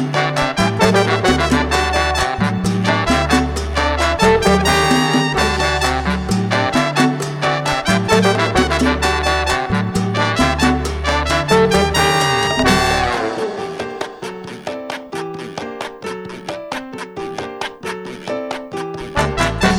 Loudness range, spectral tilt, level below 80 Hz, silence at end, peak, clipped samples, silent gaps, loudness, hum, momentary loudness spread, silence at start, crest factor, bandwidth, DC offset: 12 LU; -4.5 dB/octave; -30 dBFS; 0 s; 0 dBFS; under 0.1%; none; -16 LUFS; none; 13 LU; 0 s; 16 dB; 17 kHz; under 0.1%